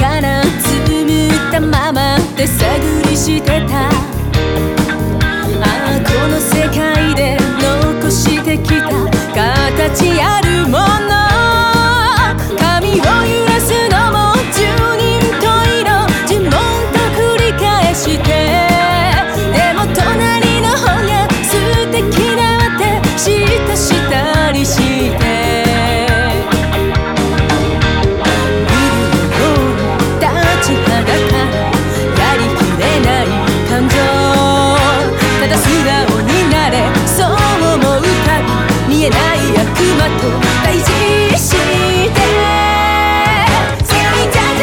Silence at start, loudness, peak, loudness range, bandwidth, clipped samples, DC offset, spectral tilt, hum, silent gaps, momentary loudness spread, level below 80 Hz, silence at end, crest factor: 0 s; -11 LUFS; 0 dBFS; 2 LU; 19.5 kHz; under 0.1%; 0.1%; -4.5 dB/octave; none; none; 3 LU; -22 dBFS; 0 s; 12 dB